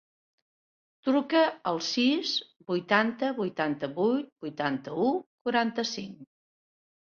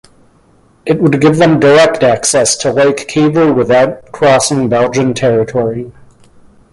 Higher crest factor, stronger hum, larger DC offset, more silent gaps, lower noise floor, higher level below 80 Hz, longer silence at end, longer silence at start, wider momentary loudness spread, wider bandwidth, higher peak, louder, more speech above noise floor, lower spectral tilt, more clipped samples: first, 22 dB vs 12 dB; neither; neither; first, 4.32-4.36 s, 5.26-5.45 s vs none; first, under -90 dBFS vs -48 dBFS; second, -74 dBFS vs -46 dBFS; about the same, 0.8 s vs 0.8 s; first, 1.05 s vs 0.85 s; about the same, 8 LU vs 8 LU; second, 7.2 kHz vs 11.5 kHz; second, -8 dBFS vs 0 dBFS; second, -28 LUFS vs -10 LUFS; first, over 62 dB vs 38 dB; about the same, -4.5 dB/octave vs -4.5 dB/octave; neither